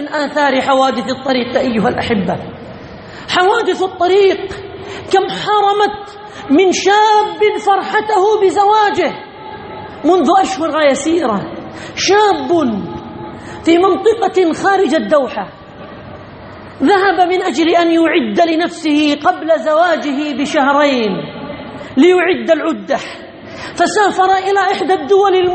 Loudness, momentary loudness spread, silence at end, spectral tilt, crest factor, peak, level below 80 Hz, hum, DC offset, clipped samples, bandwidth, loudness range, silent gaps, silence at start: -13 LUFS; 18 LU; 0 s; -4.5 dB/octave; 14 dB; 0 dBFS; -50 dBFS; none; under 0.1%; under 0.1%; 8.8 kHz; 3 LU; none; 0 s